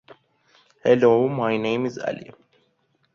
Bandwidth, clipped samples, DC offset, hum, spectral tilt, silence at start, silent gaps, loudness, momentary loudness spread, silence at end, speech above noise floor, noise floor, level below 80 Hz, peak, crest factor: 7 kHz; under 0.1%; under 0.1%; none; -7 dB/octave; 0.1 s; none; -21 LUFS; 14 LU; 0.85 s; 47 dB; -68 dBFS; -66 dBFS; -4 dBFS; 18 dB